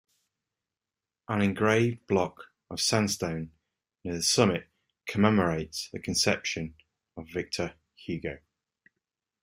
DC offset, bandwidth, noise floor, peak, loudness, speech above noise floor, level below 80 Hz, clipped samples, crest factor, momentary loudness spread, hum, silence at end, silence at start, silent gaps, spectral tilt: under 0.1%; 16 kHz; under -90 dBFS; -6 dBFS; -28 LUFS; over 62 dB; -60 dBFS; under 0.1%; 24 dB; 17 LU; none; 1.05 s; 1.3 s; none; -4 dB/octave